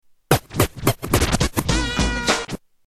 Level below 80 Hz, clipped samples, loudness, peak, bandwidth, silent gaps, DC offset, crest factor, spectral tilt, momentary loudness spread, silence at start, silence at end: -30 dBFS; under 0.1%; -21 LUFS; 0 dBFS; 14.5 kHz; none; under 0.1%; 20 dB; -4 dB/octave; 4 LU; 0.3 s; 0.3 s